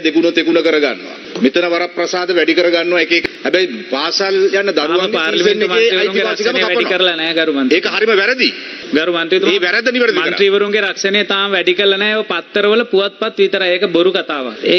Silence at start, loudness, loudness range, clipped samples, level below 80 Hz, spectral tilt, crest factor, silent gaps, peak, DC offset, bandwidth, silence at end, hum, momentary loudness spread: 0 s; -13 LUFS; 1 LU; under 0.1%; -62 dBFS; -3.5 dB/octave; 14 dB; none; 0 dBFS; under 0.1%; 6.4 kHz; 0 s; none; 5 LU